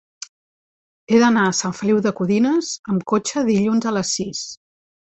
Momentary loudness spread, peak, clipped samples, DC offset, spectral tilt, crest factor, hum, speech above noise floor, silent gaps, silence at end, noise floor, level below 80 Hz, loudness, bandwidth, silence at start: 14 LU; -2 dBFS; under 0.1%; under 0.1%; -4.5 dB/octave; 18 dB; none; over 72 dB; 2.79-2.84 s; 0.55 s; under -90 dBFS; -60 dBFS; -19 LUFS; 8.2 kHz; 1.1 s